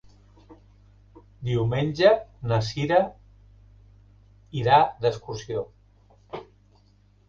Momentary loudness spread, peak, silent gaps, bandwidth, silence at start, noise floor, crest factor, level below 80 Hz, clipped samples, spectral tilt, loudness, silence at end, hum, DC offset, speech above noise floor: 21 LU; -6 dBFS; none; 7.4 kHz; 0.5 s; -58 dBFS; 22 dB; -52 dBFS; under 0.1%; -6.5 dB/octave; -24 LUFS; 0.85 s; 50 Hz at -50 dBFS; under 0.1%; 36 dB